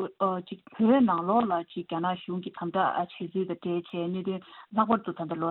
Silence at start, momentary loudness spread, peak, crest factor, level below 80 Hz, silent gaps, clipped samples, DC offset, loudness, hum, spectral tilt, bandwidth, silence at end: 0 s; 11 LU; -10 dBFS; 18 dB; -72 dBFS; none; under 0.1%; under 0.1%; -29 LUFS; none; -10.5 dB/octave; 4.2 kHz; 0 s